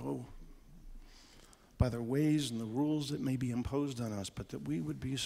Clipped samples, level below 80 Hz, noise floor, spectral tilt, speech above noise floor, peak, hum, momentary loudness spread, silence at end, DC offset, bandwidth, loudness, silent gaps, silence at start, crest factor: under 0.1%; -50 dBFS; -60 dBFS; -6 dB/octave; 24 dB; -16 dBFS; none; 10 LU; 0 s; under 0.1%; 15.5 kHz; -36 LUFS; none; 0 s; 20 dB